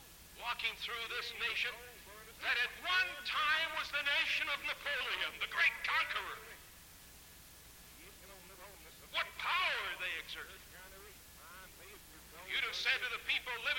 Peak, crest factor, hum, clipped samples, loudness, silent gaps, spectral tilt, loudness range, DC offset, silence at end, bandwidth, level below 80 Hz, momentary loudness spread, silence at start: -22 dBFS; 18 dB; none; under 0.1%; -35 LUFS; none; -0.5 dB/octave; 8 LU; under 0.1%; 0 s; 17 kHz; -66 dBFS; 22 LU; 0 s